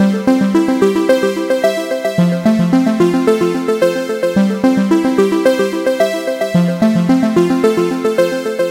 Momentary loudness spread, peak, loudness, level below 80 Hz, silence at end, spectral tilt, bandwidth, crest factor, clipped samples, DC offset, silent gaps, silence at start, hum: 4 LU; 0 dBFS; -14 LUFS; -52 dBFS; 0 s; -6.5 dB/octave; 16 kHz; 12 dB; under 0.1%; under 0.1%; none; 0 s; none